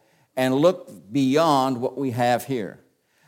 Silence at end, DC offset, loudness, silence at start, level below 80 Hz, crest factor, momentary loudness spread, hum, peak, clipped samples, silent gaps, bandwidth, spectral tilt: 0.55 s; under 0.1%; -22 LUFS; 0.35 s; -70 dBFS; 16 dB; 13 LU; none; -6 dBFS; under 0.1%; none; 17 kHz; -6 dB/octave